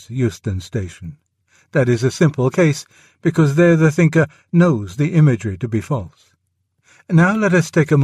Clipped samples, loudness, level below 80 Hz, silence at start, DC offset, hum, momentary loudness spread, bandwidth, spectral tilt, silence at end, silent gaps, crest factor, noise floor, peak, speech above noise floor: under 0.1%; -17 LUFS; -50 dBFS; 0.1 s; under 0.1%; none; 13 LU; 12 kHz; -7.5 dB/octave; 0 s; none; 14 dB; -68 dBFS; -2 dBFS; 52 dB